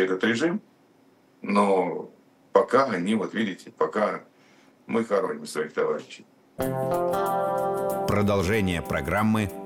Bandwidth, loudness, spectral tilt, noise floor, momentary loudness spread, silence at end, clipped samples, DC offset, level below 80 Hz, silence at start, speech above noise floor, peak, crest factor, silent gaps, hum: 17.5 kHz; -25 LUFS; -6 dB/octave; -59 dBFS; 10 LU; 0 s; under 0.1%; under 0.1%; -52 dBFS; 0 s; 34 dB; -4 dBFS; 22 dB; none; none